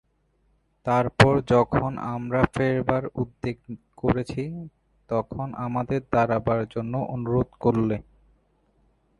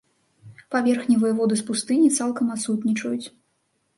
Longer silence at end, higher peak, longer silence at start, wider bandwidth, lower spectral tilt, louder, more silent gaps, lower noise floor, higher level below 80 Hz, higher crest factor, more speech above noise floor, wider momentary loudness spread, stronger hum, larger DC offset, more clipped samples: first, 1.2 s vs 0.7 s; first, 0 dBFS vs -8 dBFS; first, 0.85 s vs 0.45 s; about the same, 11.5 kHz vs 11.5 kHz; first, -7.5 dB/octave vs -4.5 dB/octave; second, -25 LUFS vs -22 LUFS; neither; about the same, -67 dBFS vs -70 dBFS; first, -46 dBFS vs -70 dBFS; first, 24 dB vs 16 dB; second, 43 dB vs 49 dB; first, 13 LU vs 9 LU; neither; neither; neither